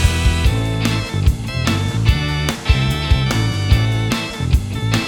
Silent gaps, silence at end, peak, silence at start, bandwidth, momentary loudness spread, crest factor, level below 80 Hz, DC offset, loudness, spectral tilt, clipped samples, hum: none; 0 s; 0 dBFS; 0 s; 18 kHz; 3 LU; 16 dB; -22 dBFS; under 0.1%; -18 LUFS; -5 dB/octave; under 0.1%; none